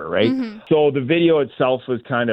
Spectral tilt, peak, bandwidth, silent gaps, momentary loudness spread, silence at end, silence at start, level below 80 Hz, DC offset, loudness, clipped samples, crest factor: -9 dB/octave; -4 dBFS; 5.6 kHz; none; 7 LU; 0 s; 0 s; -62 dBFS; under 0.1%; -19 LUFS; under 0.1%; 14 dB